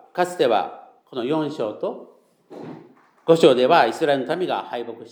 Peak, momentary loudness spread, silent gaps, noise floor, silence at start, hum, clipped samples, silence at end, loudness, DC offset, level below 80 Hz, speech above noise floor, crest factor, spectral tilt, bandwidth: -2 dBFS; 23 LU; none; -49 dBFS; 0.15 s; none; under 0.1%; 0.05 s; -20 LUFS; under 0.1%; -82 dBFS; 29 dB; 20 dB; -5.5 dB/octave; 19.5 kHz